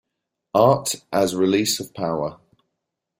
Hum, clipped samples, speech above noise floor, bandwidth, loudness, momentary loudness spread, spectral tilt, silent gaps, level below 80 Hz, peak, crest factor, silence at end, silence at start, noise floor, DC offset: none; under 0.1%; 60 dB; 16.5 kHz; -21 LUFS; 9 LU; -4.5 dB/octave; none; -60 dBFS; -2 dBFS; 20 dB; 0.85 s; 0.55 s; -81 dBFS; under 0.1%